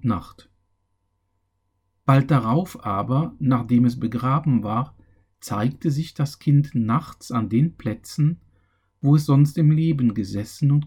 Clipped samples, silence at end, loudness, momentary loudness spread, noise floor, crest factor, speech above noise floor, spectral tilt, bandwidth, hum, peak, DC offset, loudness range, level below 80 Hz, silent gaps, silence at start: under 0.1%; 0 s; -22 LUFS; 10 LU; -71 dBFS; 16 dB; 51 dB; -8 dB/octave; 15 kHz; none; -6 dBFS; under 0.1%; 3 LU; -54 dBFS; none; 0.05 s